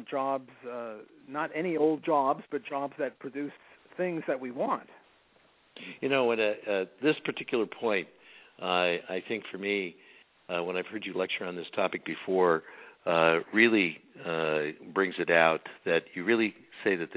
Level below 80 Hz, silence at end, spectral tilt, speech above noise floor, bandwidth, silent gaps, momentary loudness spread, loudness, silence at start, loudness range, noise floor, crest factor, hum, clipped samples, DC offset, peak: -76 dBFS; 0 s; -2.5 dB/octave; 35 dB; 4 kHz; none; 14 LU; -30 LUFS; 0 s; 7 LU; -64 dBFS; 24 dB; none; under 0.1%; under 0.1%; -6 dBFS